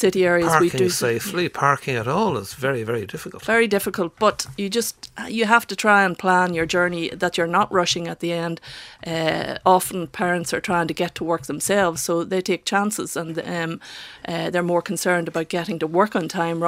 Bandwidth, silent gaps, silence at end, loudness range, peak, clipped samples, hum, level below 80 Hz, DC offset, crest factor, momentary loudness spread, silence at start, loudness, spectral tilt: 16 kHz; none; 0 s; 4 LU; 0 dBFS; under 0.1%; none; -56 dBFS; under 0.1%; 22 dB; 10 LU; 0 s; -21 LUFS; -4 dB/octave